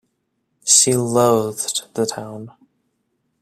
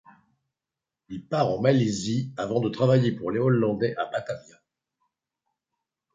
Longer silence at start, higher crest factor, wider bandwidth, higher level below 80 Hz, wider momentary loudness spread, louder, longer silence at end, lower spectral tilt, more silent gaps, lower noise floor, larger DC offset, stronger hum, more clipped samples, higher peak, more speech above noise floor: second, 0.65 s vs 1.1 s; about the same, 20 dB vs 20 dB; first, 16 kHz vs 9.2 kHz; about the same, -60 dBFS vs -62 dBFS; first, 19 LU vs 13 LU; first, -16 LUFS vs -25 LUFS; second, 0.9 s vs 1.75 s; second, -3 dB/octave vs -7 dB/octave; neither; second, -71 dBFS vs -89 dBFS; neither; neither; neither; first, 0 dBFS vs -6 dBFS; second, 52 dB vs 64 dB